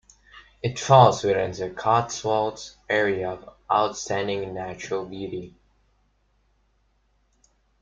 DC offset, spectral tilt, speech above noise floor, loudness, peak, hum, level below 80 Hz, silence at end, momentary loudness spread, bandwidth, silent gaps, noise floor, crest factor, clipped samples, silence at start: under 0.1%; -5 dB/octave; 43 dB; -23 LUFS; -2 dBFS; none; -58 dBFS; 2.3 s; 16 LU; 7.8 kHz; none; -66 dBFS; 24 dB; under 0.1%; 0.35 s